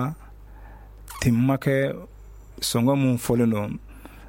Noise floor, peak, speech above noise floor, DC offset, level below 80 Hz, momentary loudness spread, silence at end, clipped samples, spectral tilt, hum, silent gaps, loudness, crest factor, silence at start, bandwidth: -44 dBFS; -8 dBFS; 22 dB; under 0.1%; -46 dBFS; 17 LU; 0 s; under 0.1%; -6 dB/octave; none; none; -23 LUFS; 18 dB; 0 s; 17 kHz